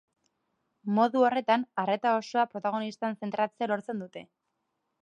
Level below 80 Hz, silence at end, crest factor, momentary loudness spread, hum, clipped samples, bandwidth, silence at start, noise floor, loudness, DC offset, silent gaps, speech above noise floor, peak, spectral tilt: -84 dBFS; 0.8 s; 20 dB; 14 LU; none; under 0.1%; 9.4 kHz; 0.85 s; -80 dBFS; -29 LUFS; under 0.1%; none; 52 dB; -10 dBFS; -6 dB/octave